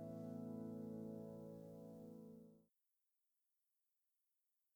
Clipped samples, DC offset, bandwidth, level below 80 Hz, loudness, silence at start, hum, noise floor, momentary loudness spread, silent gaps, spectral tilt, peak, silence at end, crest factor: under 0.1%; under 0.1%; over 20 kHz; -86 dBFS; -54 LUFS; 0 s; none; -90 dBFS; 10 LU; none; -9.5 dB/octave; -40 dBFS; 2.1 s; 16 dB